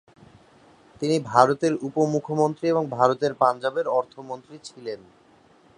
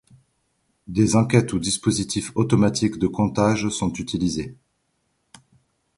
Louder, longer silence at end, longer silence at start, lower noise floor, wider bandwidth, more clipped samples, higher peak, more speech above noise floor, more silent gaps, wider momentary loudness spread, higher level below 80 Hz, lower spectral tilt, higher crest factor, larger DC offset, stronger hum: about the same, -23 LUFS vs -22 LUFS; second, 0.8 s vs 1.45 s; about the same, 1 s vs 0.9 s; second, -56 dBFS vs -71 dBFS; about the same, 11 kHz vs 11.5 kHz; neither; about the same, 0 dBFS vs -2 dBFS; second, 33 dB vs 50 dB; neither; first, 18 LU vs 7 LU; second, -68 dBFS vs -48 dBFS; about the same, -6 dB/octave vs -5.5 dB/octave; about the same, 24 dB vs 20 dB; neither; neither